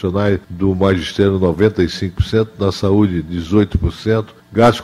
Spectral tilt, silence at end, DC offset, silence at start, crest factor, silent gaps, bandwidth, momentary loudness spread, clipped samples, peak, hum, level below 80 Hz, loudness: -7 dB/octave; 0 s; under 0.1%; 0 s; 16 dB; none; 13 kHz; 5 LU; under 0.1%; 0 dBFS; none; -32 dBFS; -16 LUFS